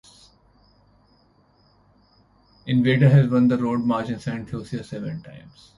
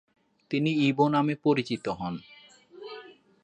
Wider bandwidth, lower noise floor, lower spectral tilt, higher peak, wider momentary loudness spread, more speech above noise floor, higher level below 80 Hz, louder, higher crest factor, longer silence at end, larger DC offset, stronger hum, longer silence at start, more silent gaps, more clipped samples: first, 11 kHz vs 9 kHz; first, -59 dBFS vs -52 dBFS; first, -8.5 dB/octave vs -7 dB/octave; first, -6 dBFS vs -10 dBFS; about the same, 18 LU vs 20 LU; first, 38 dB vs 27 dB; first, -56 dBFS vs -66 dBFS; first, -21 LUFS vs -27 LUFS; about the same, 18 dB vs 20 dB; about the same, 0.4 s vs 0.35 s; neither; first, 50 Hz at -55 dBFS vs none; first, 2.65 s vs 0.5 s; neither; neither